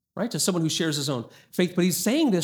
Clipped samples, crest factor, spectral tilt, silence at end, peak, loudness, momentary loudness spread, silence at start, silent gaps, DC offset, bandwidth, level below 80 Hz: under 0.1%; 16 dB; -4.5 dB/octave; 0 s; -8 dBFS; -25 LUFS; 8 LU; 0.15 s; none; under 0.1%; over 20 kHz; -70 dBFS